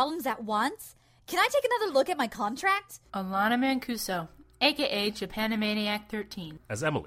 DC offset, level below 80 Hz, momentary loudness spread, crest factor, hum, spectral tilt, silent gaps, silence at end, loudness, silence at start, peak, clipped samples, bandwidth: under 0.1%; -60 dBFS; 12 LU; 18 dB; none; -4 dB/octave; none; 0 s; -29 LUFS; 0 s; -10 dBFS; under 0.1%; 16 kHz